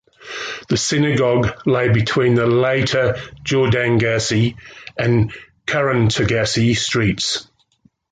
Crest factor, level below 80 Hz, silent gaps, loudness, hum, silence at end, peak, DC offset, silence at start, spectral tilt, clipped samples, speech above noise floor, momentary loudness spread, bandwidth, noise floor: 12 dB; -42 dBFS; none; -17 LUFS; none; 0.7 s; -4 dBFS; under 0.1%; 0.2 s; -5 dB/octave; under 0.1%; 41 dB; 10 LU; 9.4 kHz; -58 dBFS